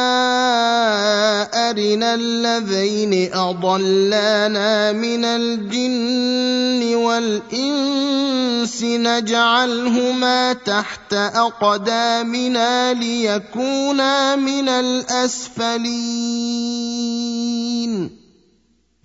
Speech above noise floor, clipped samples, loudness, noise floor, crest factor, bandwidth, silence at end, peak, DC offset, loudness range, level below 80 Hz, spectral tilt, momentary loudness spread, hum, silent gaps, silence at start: 42 dB; under 0.1%; -18 LUFS; -61 dBFS; 16 dB; 8 kHz; 0.9 s; -2 dBFS; under 0.1%; 3 LU; -62 dBFS; -3 dB/octave; 6 LU; none; none; 0 s